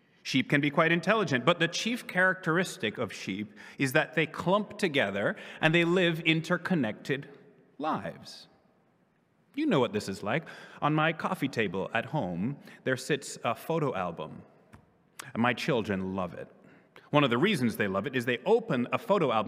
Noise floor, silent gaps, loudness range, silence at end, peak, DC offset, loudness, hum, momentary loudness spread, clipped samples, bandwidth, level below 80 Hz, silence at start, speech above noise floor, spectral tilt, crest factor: -68 dBFS; none; 6 LU; 0 s; -8 dBFS; under 0.1%; -29 LUFS; none; 11 LU; under 0.1%; 16 kHz; -76 dBFS; 0.25 s; 39 dB; -5.5 dB/octave; 22 dB